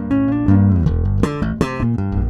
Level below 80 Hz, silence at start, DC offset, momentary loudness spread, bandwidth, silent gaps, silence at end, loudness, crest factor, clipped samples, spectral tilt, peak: -26 dBFS; 0 s; under 0.1%; 6 LU; 9.8 kHz; none; 0 s; -17 LUFS; 16 dB; under 0.1%; -9 dB/octave; 0 dBFS